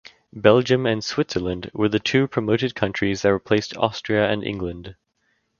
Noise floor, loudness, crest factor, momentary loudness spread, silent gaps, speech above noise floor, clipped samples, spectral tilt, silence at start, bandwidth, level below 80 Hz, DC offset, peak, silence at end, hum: -69 dBFS; -21 LUFS; 22 dB; 11 LU; none; 48 dB; under 0.1%; -5.5 dB/octave; 0.35 s; 7.2 kHz; -48 dBFS; under 0.1%; 0 dBFS; 0.7 s; none